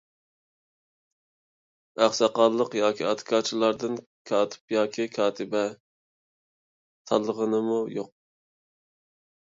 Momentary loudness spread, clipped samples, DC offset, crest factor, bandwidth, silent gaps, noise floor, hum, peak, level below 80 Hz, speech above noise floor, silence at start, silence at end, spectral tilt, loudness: 10 LU; under 0.1%; under 0.1%; 22 dB; 7.8 kHz; 4.06-4.25 s, 4.61-4.68 s, 5.80-7.05 s; under -90 dBFS; none; -6 dBFS; -76 dBFS; over 65 dB; 1.95 s; 1.4 s; -4 dB/octave; -26 LUFS